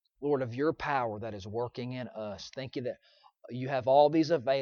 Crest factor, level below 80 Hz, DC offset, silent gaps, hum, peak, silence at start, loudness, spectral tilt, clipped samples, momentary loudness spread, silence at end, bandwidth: 20 dB; -68 dBFS; under 0.1%; none; none; -10 dBFS; 0.2 s; -31 LUFS; -6.5 dB/octave; under 0.1%; 16 LU; 0 s; 7 kHz